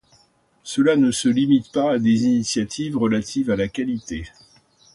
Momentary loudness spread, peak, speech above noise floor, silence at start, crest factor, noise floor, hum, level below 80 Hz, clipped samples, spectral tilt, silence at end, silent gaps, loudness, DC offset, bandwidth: 12 LU; -6 dBFS; 40 dB; 0.65 s; 14 dB; -59 dBFS; none; -50 dBFS; under 0.1%; -5 dB/octave; 0.65 s; none; -20 LUFS; under 0.1%; 11.5 kHz